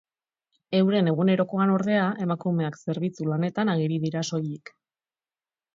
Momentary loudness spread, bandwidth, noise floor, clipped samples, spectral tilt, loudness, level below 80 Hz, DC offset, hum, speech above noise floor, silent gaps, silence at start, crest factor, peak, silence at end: 8 LU; 7.6 kHz; under -90 dBFS; under 0.1%; -7 dB/octave; -25 LUFS; -72 dBFS; under 0.1%; none; over 66 dB; none; 0.7 s; 16 dB; -10 dBFS; 1.2 s